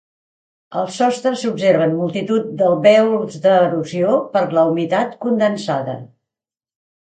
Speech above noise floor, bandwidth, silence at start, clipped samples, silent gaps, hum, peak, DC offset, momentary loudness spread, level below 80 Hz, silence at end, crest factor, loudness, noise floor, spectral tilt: 72 dB; 9.2 kHz; 0.7 s; under 0.1%; none; none; 0 dBFS; under 0.1%; 9 LU; -66 dBFS; 1 s; 16 dB; -17 LUFS; -88 dBFS; -6 dB/octave